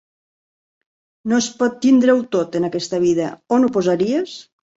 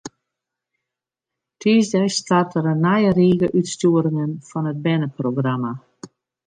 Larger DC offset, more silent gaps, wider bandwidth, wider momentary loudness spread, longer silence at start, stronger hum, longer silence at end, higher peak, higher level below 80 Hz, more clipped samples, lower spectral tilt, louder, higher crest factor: neither; neither; second, 8 kHz vs 9.6 kHz; about the same, 8 LU vs 10 LU; first, 1.25 s vs 0.05 s; neither; about the same, 0.35 s vs 0.4 s; about the same, -4 dBFS vs -6 dBFS; about the same, -60 dBFS vs -58 dBFS; neither; about the same, -5 dB/octave vs -6 dB/octave; about the same, -18 LUFS vs -19 LUFS; about the same, 16 dB vs 14 dB